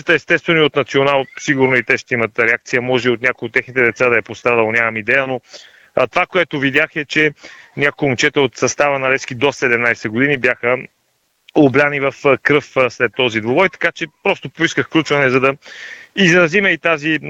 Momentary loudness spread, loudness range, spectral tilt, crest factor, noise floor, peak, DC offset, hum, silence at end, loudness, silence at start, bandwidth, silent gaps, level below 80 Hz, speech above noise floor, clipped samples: 6 LU; 1 LU; -4.5 dB/octave; 16 dB; -64 dBFS; 0 dBFS; under 0.1%; none; 0 s; -15 LUFS; 0.05 s; 9.2 kHz; none; -54 dBFS; 48 dB; under 0.1%